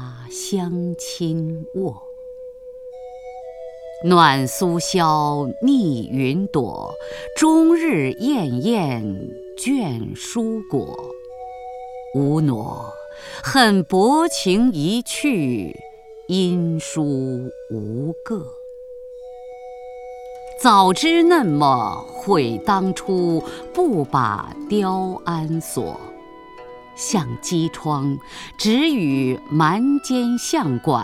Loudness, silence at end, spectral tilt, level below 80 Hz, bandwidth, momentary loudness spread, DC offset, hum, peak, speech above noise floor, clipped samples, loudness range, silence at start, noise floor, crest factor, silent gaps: -20 LUFS; 0 s; -5.5 dB/octave; -52 dBFS; 16 kHz; 21 LU; under 0.1%; none; 0 dBFS; 21 dB; under 0.1%; 8 LU; 0 s; -40 dBFS; 20 dB; none